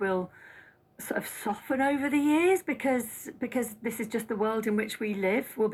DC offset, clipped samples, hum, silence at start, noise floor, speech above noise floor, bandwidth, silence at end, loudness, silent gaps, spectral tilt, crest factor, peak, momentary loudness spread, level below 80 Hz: under 0.1%; under 0.1%; none; 0 s; -55 dBFS; 26 dB; 16 kHz; 0 s; -29 LUFS; none; -5 dB/octave; 16 dB; -14 dBFS; 10 LU; -68 dBFS